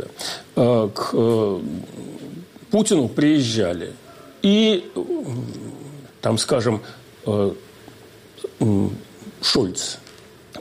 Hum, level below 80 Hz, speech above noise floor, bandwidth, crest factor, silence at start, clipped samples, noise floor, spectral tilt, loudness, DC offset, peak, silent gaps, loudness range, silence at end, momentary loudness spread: none; -56 dBFS; 25 dB; 16 kHz; 16 dB; 0 s; under 0.1%; -45 dBFS; -5 dB/octave; -21 LUFS; under 0.1%; -8 dBFS; none; 4 LU; 0 s; 19 LU